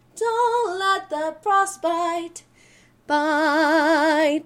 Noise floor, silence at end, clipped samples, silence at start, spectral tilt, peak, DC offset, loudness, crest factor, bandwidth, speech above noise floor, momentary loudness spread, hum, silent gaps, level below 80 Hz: -54 dBFS; 0.05 s; under 0.1%; 0.15 s; -2 dB/octave; -8 dBFS; under 0.1%; -21 LUFS; 14 dB; 16 kHz; 34 dB; 8 LU; none; none; -66 dBFS